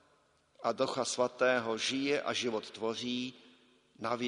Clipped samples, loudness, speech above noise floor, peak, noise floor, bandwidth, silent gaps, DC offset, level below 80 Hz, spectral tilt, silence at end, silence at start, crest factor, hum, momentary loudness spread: under 0.1%; -34 LUFS; 36 dB; -16 dBFS; -70 dBFS; 10.5 kHz; none; under 0.1%; -78 dBFS; -3 dB/octave; 0 s; 0.6 s; 20 dB; none; 8 LU